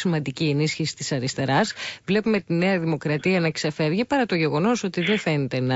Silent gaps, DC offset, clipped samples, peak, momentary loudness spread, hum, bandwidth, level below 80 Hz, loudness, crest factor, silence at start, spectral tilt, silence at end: none; under 0.1%; under 0.1%; -8 dBFS; 4 LU; none; 8 kHz; -58 dBFS; -23 LUFS; 14 dB; 0 s; -5.5 dB/octave; 0 s